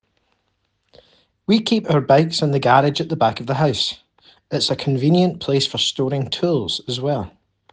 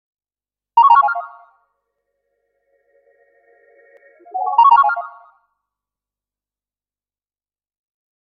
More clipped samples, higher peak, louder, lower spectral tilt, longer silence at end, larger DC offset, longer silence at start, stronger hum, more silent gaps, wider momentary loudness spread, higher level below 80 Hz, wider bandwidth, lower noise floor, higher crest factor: neither; about the same, -2 dBFS vs -2 dBFS; second, -19 LUFS vs -14 LUFS; first, -5.5 dB/octave vs -2 dB/octave; second, 0.45 s vs 3.25 s; neither; first, 1.5 s vs 0.75 s; second, none vs 50 Hz at -90 dBFS; neither; second, 8 LU vs 20 LU; first, -56 dBFS vs -74 dBFS; first, 9.8 kHz vs 4.9 kHz; second, -69 dBFS vs under -90 dBFS; about the same, 18 dB vs 20 dB